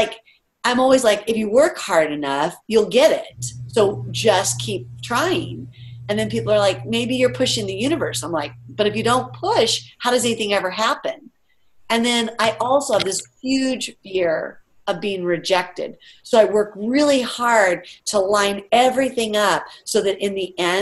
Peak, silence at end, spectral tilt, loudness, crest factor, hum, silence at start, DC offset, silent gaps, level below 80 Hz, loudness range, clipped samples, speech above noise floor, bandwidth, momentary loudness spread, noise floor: -2 dBFS; 0 s; -3.5 dB/octave; -19 LUFS; 18 dB; none; 0 s; under 0.1%; none; -56 dBFS; 3 LU; under 0.1%; 40 dB; 13 kHz; 10 LU; -59 dBFS